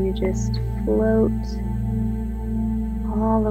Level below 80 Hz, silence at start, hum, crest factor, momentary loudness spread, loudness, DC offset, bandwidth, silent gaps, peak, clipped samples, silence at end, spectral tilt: -28 dBFS; 0 s; none; 14 dB; 8 LU; -23 LUFS; under 0.1%; 12.5 kHz; none; -8 dBFS; under 0.1%; 0 s; -8 dB/octave